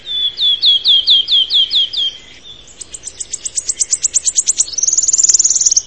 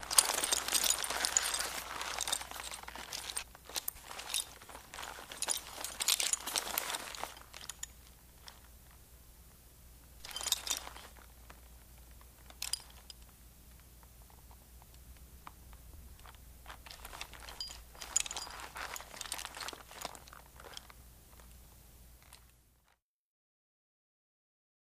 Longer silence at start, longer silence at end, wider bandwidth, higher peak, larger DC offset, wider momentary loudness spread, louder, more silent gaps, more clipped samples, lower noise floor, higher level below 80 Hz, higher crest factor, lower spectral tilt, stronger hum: about the same, 0.05 s vs 0 s; second, 0 s vs 2.5 s; second, 11 kHz vs 15.5 kHz; first, 0 dBFS vs -6 dBFS; first, 0.6% vs under 0.1%; second, 14 LU vs 26 LU; first, -10 LUFS vs -36 LUFS; neither; neither; second, -37 dBFS vs -75 dBFS; first, -50 dBFS vs -60 dBFS; second, 14 dB vs 34 dB; second, 3.5 dB/octave vs 0.5 dB/octave; neither